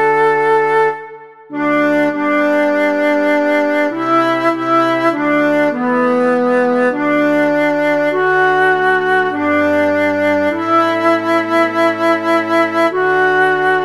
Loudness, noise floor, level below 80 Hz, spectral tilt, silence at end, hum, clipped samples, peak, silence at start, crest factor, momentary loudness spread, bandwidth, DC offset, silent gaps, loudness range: -13 LUFS; -34 dBFS; -66 dBFS; -5.5 dB/octave; 0 s; none; under 0.1%; -2 dBFS; 0 s; 10 dB; 3 LU; 13 kHz; 0.4%; none; 1 LU